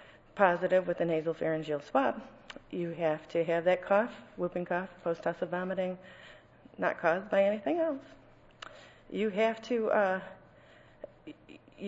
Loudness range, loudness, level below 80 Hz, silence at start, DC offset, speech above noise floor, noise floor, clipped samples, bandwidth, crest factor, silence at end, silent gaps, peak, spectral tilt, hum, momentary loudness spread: 3 LU; -31 LUFS; -68 dBFS; 0 s; under 0.1%; 27 dB; -58 dBFS; under 0.1%; 8 kHz; 24 dB; 0 s; none; -10 dBFS; -7 dB/octave; none; 21 LU